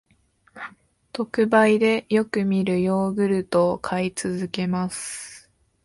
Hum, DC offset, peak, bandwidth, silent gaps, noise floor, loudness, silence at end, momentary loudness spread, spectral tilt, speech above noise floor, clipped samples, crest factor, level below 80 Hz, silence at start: none; under 0.1%; -6 dBFS; 11.5 kHz; none; -62 dBFS; -22 LUFS; 0.45 s; 19 LU; -5.5 dB/octave; 40 dB; under 0.1%; 18 dB; -60 dBFS; 0.55 s